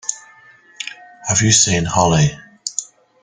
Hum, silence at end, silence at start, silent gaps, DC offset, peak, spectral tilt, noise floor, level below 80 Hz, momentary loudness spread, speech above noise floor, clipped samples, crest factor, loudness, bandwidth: none; 0.4 s; 0.05 s; none; under 0.1%; 0 dBFS; -3.5 dB/octave; -47 dBFS; -44 dBFS; 18 LU; 33 dB; under 0.1%; 18 dB; -15 LUFS; 10 kHz